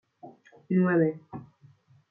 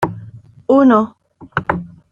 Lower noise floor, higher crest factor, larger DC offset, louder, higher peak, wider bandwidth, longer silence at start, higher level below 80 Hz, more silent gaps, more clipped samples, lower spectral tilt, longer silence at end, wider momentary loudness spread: first, -59 dBFS vs -38 dBFS; about the same, 16 dB vs 16 dB; neither; second, -26 LUFS vs -16 LUFS; second, -14 dBFS vs -2 dBFS; second, 2.9 kHz vs 7 kHz; first, 0.25 s vs 0 s; second, -72 dBFS vs -48 dBFS; neither; neither; first, -12 dB/octave vs -8.5 dB/octave; first, 0.65 s vs 0.25 s; first, 21 LU vs 17 LU